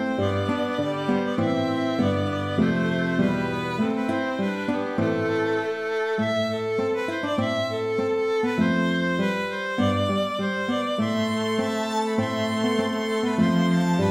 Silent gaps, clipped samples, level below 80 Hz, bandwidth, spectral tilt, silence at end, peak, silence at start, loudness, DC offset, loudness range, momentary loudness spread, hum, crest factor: none; under 0.1%; -60 dBFS; 15 kHz; -6 dB/octave; 0 s; -10 dBFS; 0 s; -24 LUFS; under 0.1%; 1 LU; 4 LU; none; 14 dB